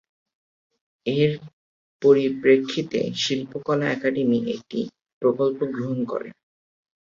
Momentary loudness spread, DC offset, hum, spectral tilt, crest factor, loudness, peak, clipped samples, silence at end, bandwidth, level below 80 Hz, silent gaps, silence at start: 12 LU; under 0.1%; none; -6 dB/octave; 20 dB; -23 LUFS; -4 dBFS; under 0.1%; 0.7 s; 7.4 kHz; -66 dBFS; 1.53-2.00 s, 5.13-5.21 s; 1.05 s